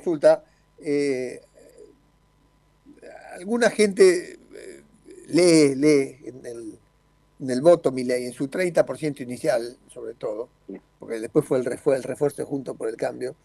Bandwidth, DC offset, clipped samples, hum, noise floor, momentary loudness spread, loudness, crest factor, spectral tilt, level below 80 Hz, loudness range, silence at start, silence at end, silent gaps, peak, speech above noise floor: 12.5 kHz; under 0.1%; under 0.1%; 50 Hz at -60 dBFS; -61 dBFS; 23 LU; -22 LUFS; 22 dB; -5 dB/octave; -64 dBFS; 7 LU; 0.05 s; 0.1 s; none; -2 dBFS; 39 dB